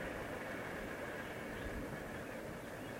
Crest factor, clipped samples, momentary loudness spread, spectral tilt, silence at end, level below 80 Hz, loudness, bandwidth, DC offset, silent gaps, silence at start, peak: 14 dB; under 0.1%; 3 LU; -5 dB/octave; 0 s; -58 dBFS; -45 LUFS; 16 kHz; under 0.1%; none; 0 s; -32 dBFS